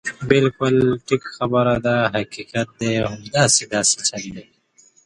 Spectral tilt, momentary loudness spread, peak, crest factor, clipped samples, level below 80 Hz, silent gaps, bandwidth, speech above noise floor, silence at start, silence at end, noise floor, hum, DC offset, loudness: -3.5 dB/octave; 10 LU; 0 dBFS; 20 dB; under 0.1%; -50 dBFS; none; 11.5 kHz; 36 dB; 0.05 s; 0.65 s; -55 dBFS; none; under 0.1%; -19 LUFS